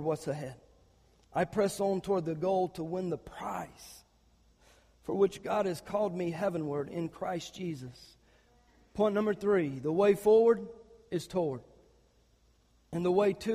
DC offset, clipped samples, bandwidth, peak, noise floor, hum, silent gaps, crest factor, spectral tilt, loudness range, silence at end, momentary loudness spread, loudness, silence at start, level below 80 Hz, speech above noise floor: under 0.1%; under 0.1%; 15.5 kHz; -14 dBFS; -67 dBFS; none; none; 18 dB; -6.5 dB/octave; 7 LU; 0 s; 14 LU; -31 LUFS; 0 s; -64 dBFS; 36 dB